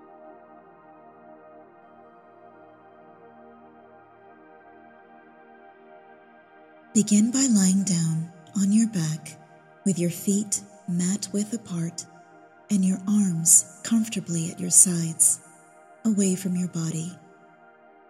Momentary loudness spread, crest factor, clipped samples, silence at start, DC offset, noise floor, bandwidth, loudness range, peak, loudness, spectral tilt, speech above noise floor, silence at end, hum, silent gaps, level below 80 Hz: 15 LU; 24 dB; under 0.1%; 0.25 s; under 0.1%; -53 dBFS; 14 kHz; 8 LU; -2 dBFS; -23 LUFS; -4.5 dB/octave; 30 dB; 0.95 s; none; none; -74 dBFS